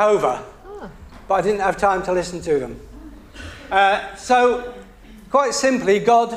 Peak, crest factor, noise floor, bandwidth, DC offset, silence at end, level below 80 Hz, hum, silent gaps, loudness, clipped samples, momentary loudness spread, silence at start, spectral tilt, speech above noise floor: -2 dBFS; 18 dB; -39 dBFS; 15 kHz; under 0.1%; 0 s; -44 dBFS; none; none; -19 LUFS; under 0.1%; 21 LU; 0 s; -4 dB/octave; 21 dB